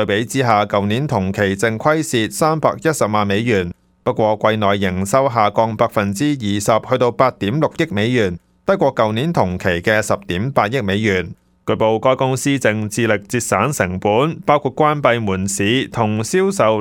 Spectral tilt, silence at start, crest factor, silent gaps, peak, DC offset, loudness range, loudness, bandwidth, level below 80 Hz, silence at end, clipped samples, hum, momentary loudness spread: -5 dB/octave; 0 s; 16 dB; none; 0 dBFS; under 0.1%; 1 LU; -17 LUFS; 17.5 kHz; -50 dBFS; 0 s; under 0.1%; none; 4 LU